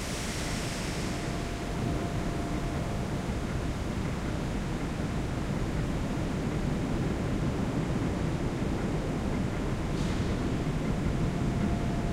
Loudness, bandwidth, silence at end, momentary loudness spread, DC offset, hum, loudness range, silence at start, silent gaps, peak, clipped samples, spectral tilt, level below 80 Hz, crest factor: -32 LUFS; 16 kHz; 0 s; 3 LU; under 0.1%; none; 2 LU; 0 s; none; -18 dBFS; under 0.1%; -6 dB/octave; -38 dBFS; 14 dB